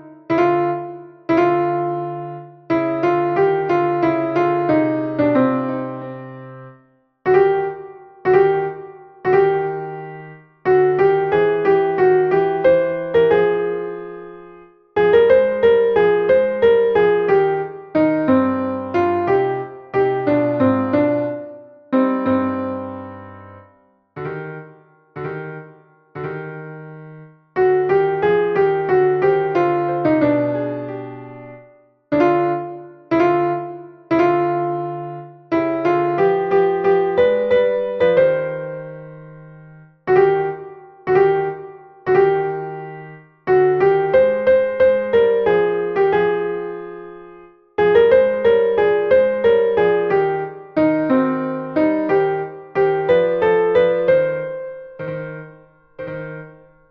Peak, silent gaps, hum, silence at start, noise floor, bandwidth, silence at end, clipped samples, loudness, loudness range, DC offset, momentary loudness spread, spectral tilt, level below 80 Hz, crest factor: -2 dBFS; none; none; 0 s; -55 dBFS; 5.8 kHz; 0.4 s; under 0.1%; -17 LUFS; 5 LU; under 0.1%; 18 LU; -9 dB/octave; -54 dBFS; 16 dB